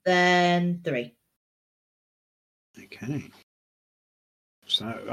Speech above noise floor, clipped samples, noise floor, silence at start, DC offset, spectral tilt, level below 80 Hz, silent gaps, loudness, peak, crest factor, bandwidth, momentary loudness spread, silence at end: over 65 dB; under 0.1%; under -90 dBFS; 0.05 s; under 0.1%; -5 dB/octave; -72 dBFS; 1.36-2.74 s, 3.43-4.62 s; -25 LUFS; -10 dBFS; 18 dB; 13 kHz; 16 LU; 0 s